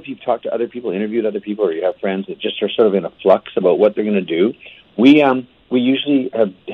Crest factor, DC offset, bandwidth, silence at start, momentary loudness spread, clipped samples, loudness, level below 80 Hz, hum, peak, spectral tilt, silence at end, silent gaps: 16 dB; under 0.1%; 6.4 kHz; 0.05 s; 10 LU; under 0.1%; -17 LUFS; -62 dBFS; none; 0 dBFS; -7.5 dB/octave; 0 s; none